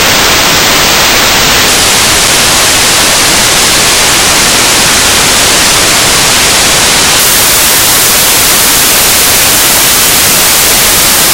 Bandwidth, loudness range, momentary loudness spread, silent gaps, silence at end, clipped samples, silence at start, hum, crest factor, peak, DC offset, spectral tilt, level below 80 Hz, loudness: over 20 kHz; 1 LU; 1 LU; none; 0 s; 5%; 0 s; none; 6 dB; 0 dBFS; under 0.1%; -0.5 dB/octave; -26 dBFS; -3 LUFS